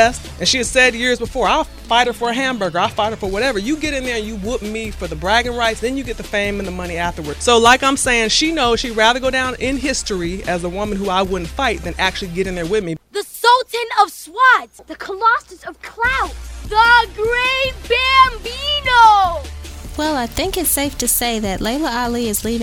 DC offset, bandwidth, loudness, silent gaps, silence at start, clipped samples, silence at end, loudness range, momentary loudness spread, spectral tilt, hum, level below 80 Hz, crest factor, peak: under 0.1%; 16.5 kHz; -16 LUFS; none; 0 s; under 0.1%; 0 s; 5 LU; 12 LU; -2.5 dB/octave; none; -34 dBFS; 18 dB; 0 dBFS